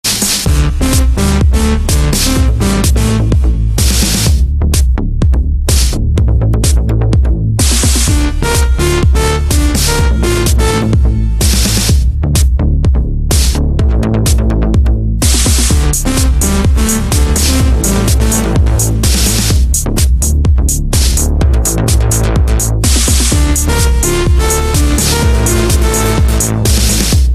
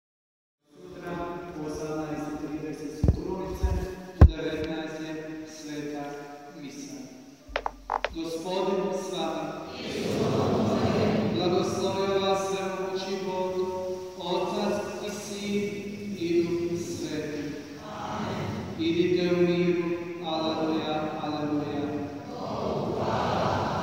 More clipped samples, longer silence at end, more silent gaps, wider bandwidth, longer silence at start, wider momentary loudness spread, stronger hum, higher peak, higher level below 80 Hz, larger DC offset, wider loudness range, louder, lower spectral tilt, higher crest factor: neither; about the same, 0 s vs 0 s; neither; about the same, 15 kHz vs 16 kHz; second, 0.05 s vs 0.75 s; second, 2 LU vs 12 LU; neither; first, 0 dBFS vs -4 dBFS; first, -12 dBFS vs -38 dBFS; neither; second, 1 LU vs 6 LU; first, -11 LUFS vs -29 LUFS; second, -4.5 dB/octave vs -6.5 dB/octave; second, 10 dB vs 24 dB